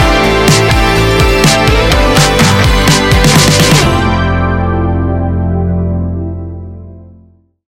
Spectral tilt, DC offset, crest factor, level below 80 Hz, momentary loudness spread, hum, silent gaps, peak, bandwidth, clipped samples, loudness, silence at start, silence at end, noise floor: -4.5 dB/octave; 0.7%; 10 dB; -18 dBFS; 10 LU; none; none; 0 dBFS; 17 kHz; 0.2%; -9 LUFS; 0 s; 0.6 s; -44 dBFS